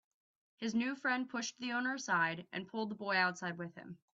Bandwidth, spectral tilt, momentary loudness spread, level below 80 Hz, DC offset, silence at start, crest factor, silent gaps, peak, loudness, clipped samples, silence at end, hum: 7.8 kHz; -3.5 dB/octave; 10 LU; -82 dBFS; under 0.1%; 0.6 s; 20 dB; none; -18 dBFS; -37 LUFS; under 0.1%; 0.2 s; none